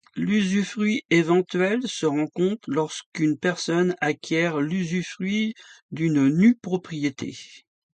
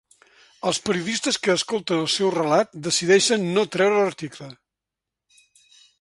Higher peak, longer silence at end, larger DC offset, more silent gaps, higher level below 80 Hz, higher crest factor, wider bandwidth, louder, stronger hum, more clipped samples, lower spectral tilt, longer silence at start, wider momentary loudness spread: about the same, -6 dBFS vs -6 dBFS; second, 0.35 s vs 1.45 s; neither; first, 1.05-1.09 s, 3.06-3.12 s, 5.82-5.89 s vs none; about the same, -66 dBFS vs -66 dBFS; about the same, 16 dB vs 18 dB; second, 9.2 kHz vs 11.5 kHz; second, -24 LUFS vs -21 LUFS; neither; neither; first, -5.5 dB/octave vs -3.5 dB/octave; second, 0.15 s vs 0.65 s; about the same, 9 LU vs 11 LU